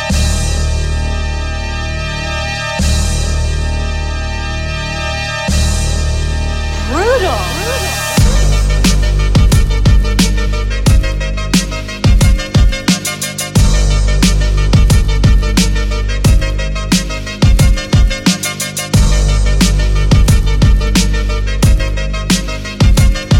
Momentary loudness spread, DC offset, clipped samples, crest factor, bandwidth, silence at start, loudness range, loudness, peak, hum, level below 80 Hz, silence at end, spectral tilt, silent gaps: 7 LU; under 0.1%; under 0.1%; 12 dB; 16.5 kHz; 0 s; 4 LU; -14 LUFS; 0 dBFS; none; -14 dBFS; 0 s; -4.5 dB/octave; none